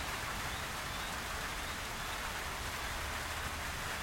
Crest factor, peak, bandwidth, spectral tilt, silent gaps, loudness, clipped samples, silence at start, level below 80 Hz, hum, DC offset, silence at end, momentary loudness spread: 14 dB; -26 dBFS; 16.5 kHz; -2.5 dB/octave; none; -39 LUFS; under 0.1%; 0 s; -50 dBFS; none; under 0.1%; 0 s; 1 LU